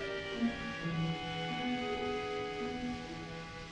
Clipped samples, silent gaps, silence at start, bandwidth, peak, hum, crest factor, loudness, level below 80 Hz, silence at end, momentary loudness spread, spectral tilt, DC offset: under 0.1%; none; 0 s; 10 kHz; -22 dBFS; none; 16 dB; -38 LUFS; -56 dBFS; 0 s; 7 LU; -5.5 dB/octave; under 0.1%